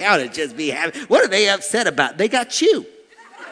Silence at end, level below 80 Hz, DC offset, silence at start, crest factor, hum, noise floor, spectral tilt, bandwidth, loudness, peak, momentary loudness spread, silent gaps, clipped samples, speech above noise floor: 0 s; -66 dBFS; under 0.1%; 0 s; 18 dB; none; -41 dBFS; -2 dB/octave; 11 kHz; -18 LUFS; 0 dBFS; 8 LU; none; under 0.1%; 23 dB